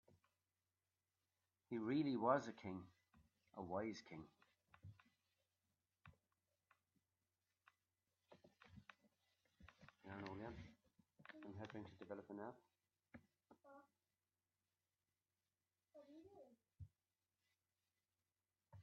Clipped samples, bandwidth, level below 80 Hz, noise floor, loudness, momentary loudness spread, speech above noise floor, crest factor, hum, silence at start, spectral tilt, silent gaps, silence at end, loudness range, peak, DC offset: under 0.1%; 6.8 kHz; -84 dBFS; under -90 dBFS; -48 LUFS; 26 LU; over 44 dB; 28 dB; none; 1.7 s; -5.5 dB/octave; none; 0 s; 15 LU; -26 dBFS; under 0.1%